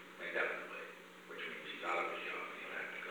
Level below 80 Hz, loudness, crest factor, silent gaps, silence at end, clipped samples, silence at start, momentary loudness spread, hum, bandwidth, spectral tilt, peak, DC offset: under -90 dBFS; -42 LUFS; 20 dB; none; 0 s; under 0.1%; 0 s; 11 LU; 60 Hz at -70 dBFS; over 20 kHz; -3 dB/octave; -24 dBFS; under 0.1%